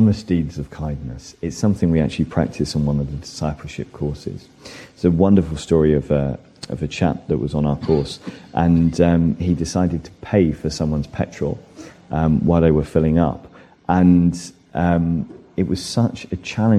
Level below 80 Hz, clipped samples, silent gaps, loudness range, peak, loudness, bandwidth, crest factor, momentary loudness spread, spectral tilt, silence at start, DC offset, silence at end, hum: -36 dBFS; under 0.1%; none; 4 LU; -2 dBFS; -20 LUFS; 11 kHz; 18 dB; 15 LU; -7.5 dB/octave; 0 s; under 0.1%; 0 s; none